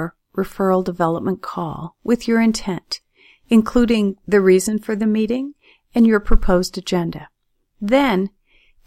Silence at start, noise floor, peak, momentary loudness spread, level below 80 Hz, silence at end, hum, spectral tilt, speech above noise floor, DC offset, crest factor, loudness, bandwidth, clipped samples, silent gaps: 0 s; -55 dBFS; 0 dBFS; 13 LU; -28 dBFS; 0.6 s; none; -6 dB/octave; 38 dB; under 0.1%; 18 dB; -19 LUFS; 15.5 kHz; under 0.1%; none